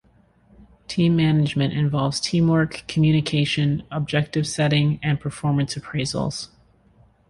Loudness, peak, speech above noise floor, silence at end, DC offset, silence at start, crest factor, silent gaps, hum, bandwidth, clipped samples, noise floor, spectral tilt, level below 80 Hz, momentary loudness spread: -22 LUFS; -6 dBFS; 36 dB; 0.85 s; under 0.1%; 0.9 s; 16 dB; none; none; 11.5 kHz; under 0.1%; -57 dBFS; -6 dB/octave; -50 dBFS; 7 LU